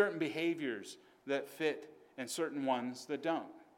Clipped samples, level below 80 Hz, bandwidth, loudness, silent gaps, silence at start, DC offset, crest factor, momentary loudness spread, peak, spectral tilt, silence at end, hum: under 0.1%; -90 dBFS; 17.5 kHz; -38 LUFS; none; 0 s; under 0.1%; 20 dB; 11 LU; -18 dBFS; -4 dB/octave; 0.15 s; none